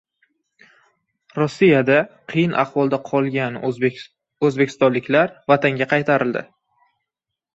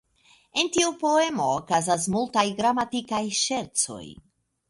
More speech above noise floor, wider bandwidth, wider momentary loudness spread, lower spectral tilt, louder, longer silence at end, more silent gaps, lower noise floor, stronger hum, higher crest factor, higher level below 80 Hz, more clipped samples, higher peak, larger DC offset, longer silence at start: first, 66 dB vs 35 dB; second, 8 kHz vs 11.5 kHz; about the same, 8 LU vs 6 LU; first, -7 dB/octave vs -3 dB/octave; first, -19 LUFS vs -24 LUFS; first, 1.1 s vs 0.55 s; neither; first, -84 dBFS vs -60 dBFS; neither; about the same, 18 dB vs 16 dB; about the same, -62 dBFS vs -62 dBFS; neither; first, -2 dBFS vs -8 dBFS; neither; first, 1.35 s vs 0.55 s